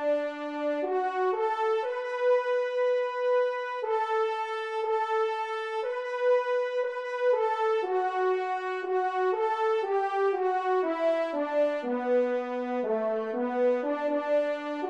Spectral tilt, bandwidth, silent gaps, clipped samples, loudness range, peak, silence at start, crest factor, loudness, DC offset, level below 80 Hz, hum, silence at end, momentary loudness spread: -4.5 dB/octave; 8.8 kHz; none; under 0.1%; 1 LU; -16 dBFS; 0 s; 12 dB; -28 LUFS; under 0.1%; -82 dBFS; none; 0 s; 5 LU